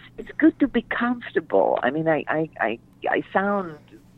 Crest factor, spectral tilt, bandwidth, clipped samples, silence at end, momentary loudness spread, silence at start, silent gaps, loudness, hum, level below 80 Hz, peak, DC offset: 16 dB; -8.5 dB/octave; 4.2 kHz; under 0.1%; 0.2 s; 7 LU; 0.05 s; none; -23 LUFS; none; -54 dBFS; -8 dBFS; under 0.1%